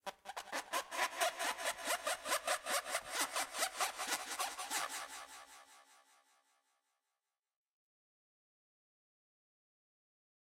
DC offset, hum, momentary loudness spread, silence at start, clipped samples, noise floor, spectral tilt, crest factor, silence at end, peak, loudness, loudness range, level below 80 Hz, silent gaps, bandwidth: under 0.1%; none; 12 LU; 0.05 s; under 0.1%; under -90 dBFS; 1.5 dB/octave; 24 dB; 4.65 s; -20 dBFS; -39 LUFS; 10 LU; -80 dBFS; none; 16 kHz